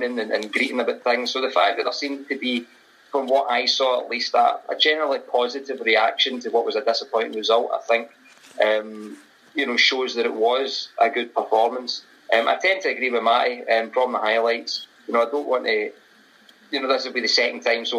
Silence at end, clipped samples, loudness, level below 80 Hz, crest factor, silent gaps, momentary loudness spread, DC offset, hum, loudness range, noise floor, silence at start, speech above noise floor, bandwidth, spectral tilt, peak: 0 s; under 0.1%; -21 LUFS; -84 dBFS; 18 dB; none; 8 LU; under 0.1%; none; 3 LU; -53 dBFS; 0 s; 31 dB; 14 kHz; -1.5 dB/octave; -4 dBFS